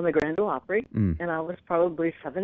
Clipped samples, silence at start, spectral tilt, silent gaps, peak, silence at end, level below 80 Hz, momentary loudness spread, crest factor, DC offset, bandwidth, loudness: under 0.1%; 0 s; -7.5 dB/octave; none; -10 dBFS; 0 s; -48 dBFS; 5 LU; 16 dB; under 0.1%; 7.2 kHz; -27 LUFS